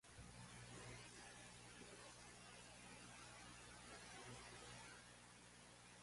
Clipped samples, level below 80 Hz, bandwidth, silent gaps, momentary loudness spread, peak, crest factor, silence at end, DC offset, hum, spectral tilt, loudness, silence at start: under 0.1%; -74 dBFS; 11.5 kHz; none; 5 LU; -44 dBFS; 16 dB; 0 s; under 0.1%; 60 Hz at -70 dBFS; -3 dB/octave; -59 LUFS; 0.05 s